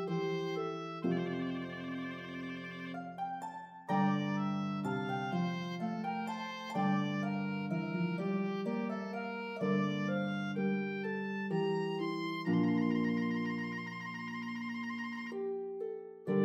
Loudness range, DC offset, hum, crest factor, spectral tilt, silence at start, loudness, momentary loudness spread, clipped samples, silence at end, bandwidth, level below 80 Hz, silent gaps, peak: 4 LU; under 0.1%; none; 16 dB; -7.5 dB/octave; 0 s; -36 LUFS; 9 LU; under 0.1%; 0 s; 7.8 kHz; -84 dBFS; none; -20 dBFS